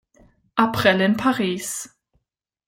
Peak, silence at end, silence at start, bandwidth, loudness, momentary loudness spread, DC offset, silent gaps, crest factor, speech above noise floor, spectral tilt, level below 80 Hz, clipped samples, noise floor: -2 dBFS; 0.8 s; 0.55 s; 16.5 kHz; -21 LUFS; 13 LU; under 0.1%; none; 20 dB; 58 dB; -4.5 dB/octave; -56 dBFS; under 0.1%; -78 dBFS